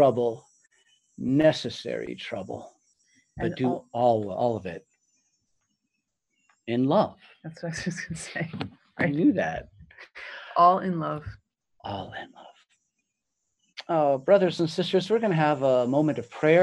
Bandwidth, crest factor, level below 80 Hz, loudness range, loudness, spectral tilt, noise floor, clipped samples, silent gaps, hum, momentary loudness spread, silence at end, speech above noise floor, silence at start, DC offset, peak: 11.5 kHz; 20 dB; -60 dBFS; 6 LU; -26 LUFS; -6.5 dB/octave; -81 dBFS; under 0.1%; none; none; 19 LU; 0 s; 56 dB; 0 s; under 0.1%; -6 dBFS